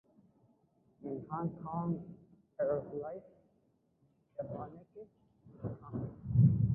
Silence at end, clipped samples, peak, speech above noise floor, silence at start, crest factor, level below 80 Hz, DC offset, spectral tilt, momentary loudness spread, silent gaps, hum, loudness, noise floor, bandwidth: 0 s; under 0.1%; -16 dBFS; 34 dB; 1 s; 22 dB; -58 dBFS; under 0.1%; -13.5 dB/octave; 24 LU; none; none; -37 LUFS; -74 dBFS; 2.1 kHz